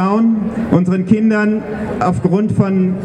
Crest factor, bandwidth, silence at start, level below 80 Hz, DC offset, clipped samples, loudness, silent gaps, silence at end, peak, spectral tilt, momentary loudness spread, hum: 14 dB; 9.4 kHz; 0 s; -42 dBFS; under 0.1%; under 0.1%; -15 LUFS; none; 0 s; 0 dBFS; -9 dB/octave; 5 LU; none